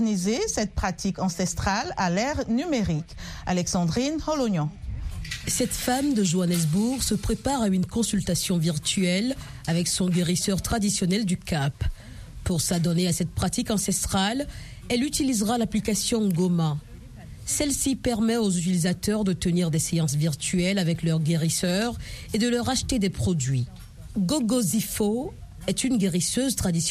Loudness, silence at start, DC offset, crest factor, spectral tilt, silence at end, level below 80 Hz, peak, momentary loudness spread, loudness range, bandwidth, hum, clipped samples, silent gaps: -25 LUFS; 0 s; under 0.1%; 14 dB; -4.5 dB/octave; 0 s; -40 dBFS; -10 dBFS; 8 LU; 2 LU; 15 kHz; none; under 0.1%; none